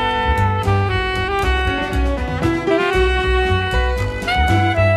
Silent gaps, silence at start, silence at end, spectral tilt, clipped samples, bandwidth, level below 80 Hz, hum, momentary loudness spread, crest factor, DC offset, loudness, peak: none; 0 s; 0 s; -6 dB/octave; under 0.1%; 13.5 kHz; -24 dBFS; none; 4 LU; 12 dB; under 0.1%; -18 LUFS; -4 dBFS